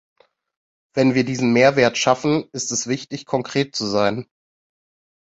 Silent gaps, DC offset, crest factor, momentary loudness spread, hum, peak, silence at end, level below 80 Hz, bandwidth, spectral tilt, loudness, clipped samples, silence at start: none; under 0.1%; 20 dB; 10 LU; none; -2 dBFS; 1.1 s; -60 dBFS; 8 kHz; -4.5 dB/octave; -19 LUFS; under 0.1%; 0.95 s